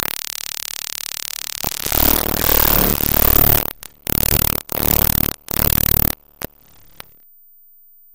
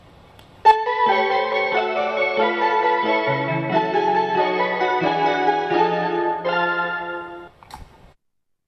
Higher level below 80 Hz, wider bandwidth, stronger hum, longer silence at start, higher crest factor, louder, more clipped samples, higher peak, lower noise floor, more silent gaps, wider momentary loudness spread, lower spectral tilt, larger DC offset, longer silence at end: first, -28 dBFS vs -58 dBFS; first, over 20 kHz vs 8 kHz; neither; second, 0 s vs 0.65 s; about the same, 18 dB vs 20 dB; first, -15 LUFS vs -20 LUFS; first, 0.1% vs under 0.1%; about the same, 0 dBFS vs -2 dBFS; second, -49 dBFS vs -70 dBFS; neither; first, 13 LU vs 4 LU; second, -3 dB/octave vs -6 dB/octave; first, 1% vs under 0.1%; second, 0 s vs 0.85 s